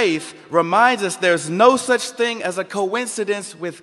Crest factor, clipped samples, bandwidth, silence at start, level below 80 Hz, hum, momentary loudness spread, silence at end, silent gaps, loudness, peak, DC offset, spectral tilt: 18 dB; under 0.1%; 12.5 kHz; 0 s; -68 dBFS; none; 9 LU; 0.05 s; none; -18 LUFS; 0 dBFS; under 0.1%; -3.5 dB/octave